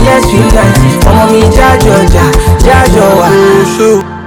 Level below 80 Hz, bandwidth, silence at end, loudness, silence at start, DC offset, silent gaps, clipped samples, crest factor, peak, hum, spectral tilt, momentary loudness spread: -12 dBFS; 19 kHz; 0 s; -5 LUFS; 0 s; under 0.1%; none; 20%; 4 dB; 0 dBFS; none; -5.5 dB/octave; 2 LU